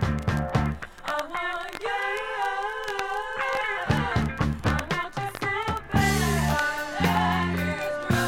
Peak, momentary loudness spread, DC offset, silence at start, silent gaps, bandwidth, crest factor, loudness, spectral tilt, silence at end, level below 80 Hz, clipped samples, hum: -8 dBFS; 7 LU; under 0.1%; 0 s; none; 17.5 kHz; 18 dB; -27 LUFS; -5 dB/octave; 0 s; -38 dBFS; under 0.1%; none